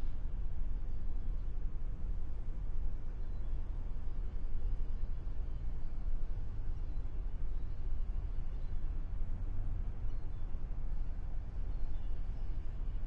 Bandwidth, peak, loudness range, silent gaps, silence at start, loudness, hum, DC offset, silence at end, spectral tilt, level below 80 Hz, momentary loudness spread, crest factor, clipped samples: 2.4 kHz; -22 dBFS; 1 LU; none; 0 s; -44 LUFS; none; under 0.1%; 0 s; -9 dB/octave; -36 dBFS; 2 LU; 10 dB; under 0.1%